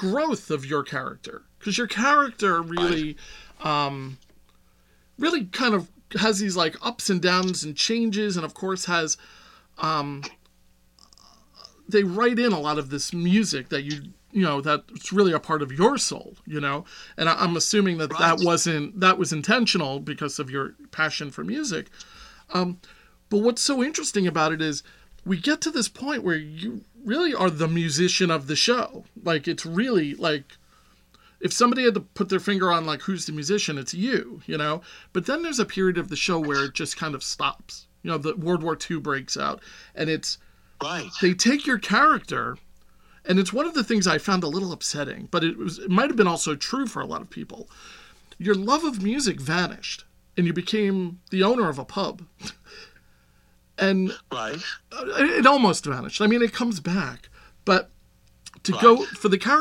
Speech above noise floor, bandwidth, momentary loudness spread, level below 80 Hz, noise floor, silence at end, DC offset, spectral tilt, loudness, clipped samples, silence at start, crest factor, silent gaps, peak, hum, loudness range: 35 dB; 14.5 kHz; 13 LU; -58 dBFS; -59 dBFS; 0 s; under 0.1%; -4 dB/octave; -24 LUFS; under 0.1%; 0 s; 24 dB; none; -2 dBFS; none; 5 LU